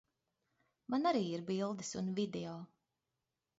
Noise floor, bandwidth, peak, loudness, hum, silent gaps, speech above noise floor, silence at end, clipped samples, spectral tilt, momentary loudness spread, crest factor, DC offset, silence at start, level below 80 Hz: -89 dBFS; 7.6 kHz; -22 dBFS; -38 LUFS; none; none; 52 dB; 0.95 s; under 0.1%; -5.5 dB/octave; 17 LU; 18 dB; under 0.1%; 0.9 s; -78 dBFS